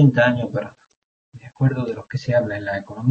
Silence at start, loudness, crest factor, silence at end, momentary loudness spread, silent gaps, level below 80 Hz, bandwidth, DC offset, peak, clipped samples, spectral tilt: 0 s; -22 LUFS; 18 dB; 0 s; 9 LU; 0.96-1.32 s; -56 dBFS; 7.2 kHz; under 0.1%; -4 dBFS; under 0.1%; -8.5 dB/octave